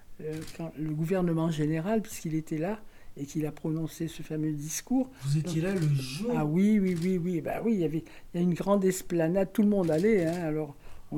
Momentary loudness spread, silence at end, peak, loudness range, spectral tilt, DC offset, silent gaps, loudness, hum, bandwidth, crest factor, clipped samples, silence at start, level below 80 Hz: 12 LU; 0 s; -14 dBFS; 5 LU; -7 dB/octave; under 0.1%; none; -29 LUFS; none; 17.5 kHz; 14 dB; under 0.1%; 0 s; -52 dBFS